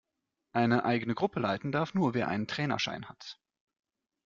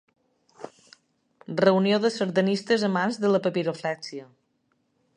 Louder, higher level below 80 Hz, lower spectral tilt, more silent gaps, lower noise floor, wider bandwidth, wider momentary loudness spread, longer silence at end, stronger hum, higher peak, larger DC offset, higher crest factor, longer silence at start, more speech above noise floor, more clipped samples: second, -31 LUFS vs -24 LUFS; first, -68 dBFS vs -76 dBFS; about the same, -6 dB/octave vs -6 dB/octave; neither; first, -84 dBFS vs -72 dBFS; second, 7.4 kHz vs 10 kHz; second, 14 LU vs 22 LU; about the same, 0.95 s vs 0.9 s; neither; second, -12 dBFS vs -6 dBFS; neither; about the same, 20 dB vs 20 dB; about the same, 0.55 s vs 0.6 s; first, 53 dB vs 48 dB; neither